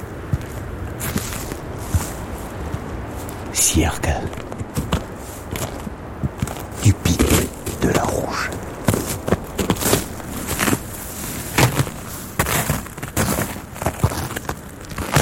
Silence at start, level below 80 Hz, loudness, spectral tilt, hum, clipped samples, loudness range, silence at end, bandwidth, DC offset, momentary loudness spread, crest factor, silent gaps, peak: 0 s; -34 dBFS; -22 LUFS; -4.5 dB/octave; none; under 0.1%; 3 LU; 0 s; 17 kHz; under 0.1%; 13 LU; 22 dB; none; -2 dBFS